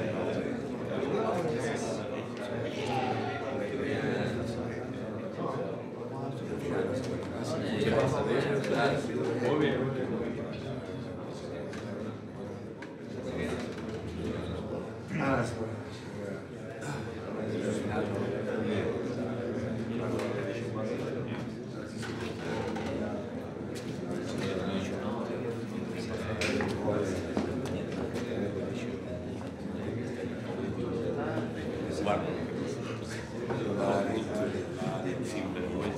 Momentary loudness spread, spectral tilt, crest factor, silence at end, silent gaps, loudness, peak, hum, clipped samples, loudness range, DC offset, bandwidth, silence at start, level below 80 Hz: 9 LU; -6.5 dB/octave; 18 dB; 0 s; none; -34 LUFS; -14 dBFS; none; under 0.1%; 5 LU; under 0.1%; 13.5 kHz; 0 s; -58 dBFS